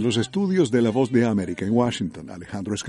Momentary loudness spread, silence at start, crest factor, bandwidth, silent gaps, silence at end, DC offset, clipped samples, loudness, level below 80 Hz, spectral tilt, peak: 12 LU; 0 s; 16 dB; 11.5 kHz; none; 0 s; under 0.1%; under 0.1%; -22 LUFS; -56 dBFS; -6 dB/octave; -6 dBFS